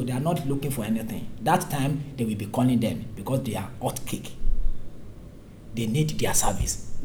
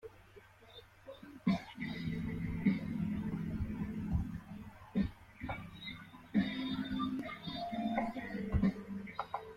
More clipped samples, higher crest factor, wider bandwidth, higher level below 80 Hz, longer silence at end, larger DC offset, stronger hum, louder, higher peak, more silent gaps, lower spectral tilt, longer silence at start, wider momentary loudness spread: neither; about the same, 18 dB vs 20 dB; first, 19 kHz vs 14 kHz; first, -34 dBFS vs -52 dBFS; about the same, 0 s vs 0 s; neither; neither; first, -27 LUFS vs -39 LUFS; first, -8 dBFS vs -20 dBFS; neither; second, -5 dB/octave vs -8 dB/octave; about the same, 0 s vs 0.05 s; about the same, 16 LU vs 18 LU